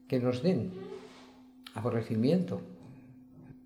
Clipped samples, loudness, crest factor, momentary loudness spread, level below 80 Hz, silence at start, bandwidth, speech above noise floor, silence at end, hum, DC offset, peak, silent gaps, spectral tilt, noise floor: under 0.1%; -32 LUFS; 18 dB; 24 LU; -70 dBFS; 0.1 s; 15.5 kHz; 24 dB; 0.05 s; none; under 0.1%; -16 dBFS; none; -8.5 dB/octave; -55 dBFS